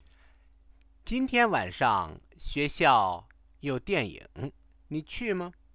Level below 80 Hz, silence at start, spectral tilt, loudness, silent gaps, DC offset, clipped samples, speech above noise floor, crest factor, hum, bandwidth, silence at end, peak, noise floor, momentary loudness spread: -50 dBFS; 1.05 s; -3 dB/octave; -28 LUFS; none; under 0.1%; under 0.1%; 31 dB; 22 dB; none; 4 kHz; 0.25 s; -8 dBFS; -59 dBFS; 17 LU